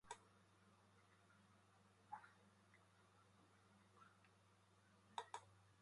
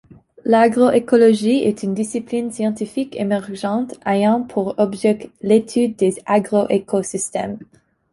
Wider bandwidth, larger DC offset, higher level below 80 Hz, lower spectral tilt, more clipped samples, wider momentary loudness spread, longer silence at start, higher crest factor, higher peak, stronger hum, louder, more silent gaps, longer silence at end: about the same, 11 kHz vs 11.5 kHz; neither; second, under -90 dBFS vs -60 dBFS; second, -3 dB/octave vs -5.5 dB/octave; neither; second, 6 LU vs 10 LU; second, 0.05 s vs 0.45 s; first, 34 dB vs 16 dB; second, -32 dBFS vs -2 dBFS; neither; second, -59 LUFS vs -18 LUFS; neither; second, 0 s vs 0.5 s